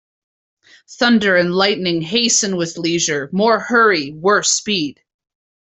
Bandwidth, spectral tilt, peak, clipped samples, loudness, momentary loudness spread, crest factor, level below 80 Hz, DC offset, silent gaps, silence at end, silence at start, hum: 8.4 kHz; -2.5 dB/octave; 0 dBFS; under 0.1%; -15 LUFS; 7 LU; 16 dB; -60 dBFS; under 0.1%; none; 0.7 s; 0.9 s; none